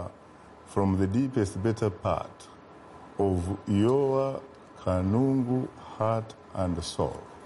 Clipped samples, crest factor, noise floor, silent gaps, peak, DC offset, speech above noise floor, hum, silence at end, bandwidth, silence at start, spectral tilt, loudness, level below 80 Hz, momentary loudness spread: under 0.1%; 16 dB; -51 dBFS; none; -14 dBFS; under 0.1%; 24 dB; none; 0 s; 11.5 kHz; 0 s; -7.5 dB/octave; -28 LUFS; -52 dBFS; 16 LU